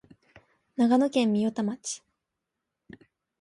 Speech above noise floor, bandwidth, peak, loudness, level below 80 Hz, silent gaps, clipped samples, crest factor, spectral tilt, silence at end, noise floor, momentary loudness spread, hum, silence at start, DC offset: 60 dB; 11.5 kHz; -12 dBFS; -26 LUFS; -72 dBFS; none; under 0.1%; 18 dB; -5 dB/octave; 1.45 s; -85 dBFS; 15 LU; none; 0.8 s; under 0.1%